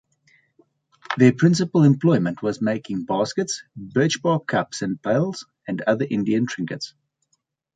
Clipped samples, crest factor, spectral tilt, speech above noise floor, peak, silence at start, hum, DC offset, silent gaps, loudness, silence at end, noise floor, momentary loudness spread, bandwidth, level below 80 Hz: under 0.1%; 20 dB; -6 dB/octave; 51 dB; -4 dBFS; 1.1 s; none; under 0.1%; none; -22 LUFS; 0.85 s; -72 dBFS; 13 LU; 9.4 kHz; -62 dBFS